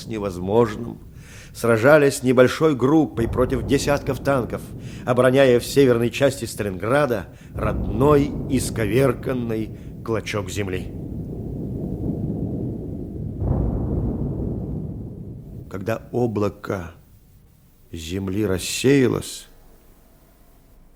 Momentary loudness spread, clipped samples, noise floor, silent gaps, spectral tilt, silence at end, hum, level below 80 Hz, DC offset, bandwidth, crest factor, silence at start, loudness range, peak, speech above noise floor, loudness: 16 LU; under 0.1%; -52 dBFS; none; -6 dB/octave; 1.5 s; none; -36 dBFS; under 0.1%; 17.5 kHz; 22 dB; 0 s; 9 LU; 0 dBFS; 32 dB; -21 LUFS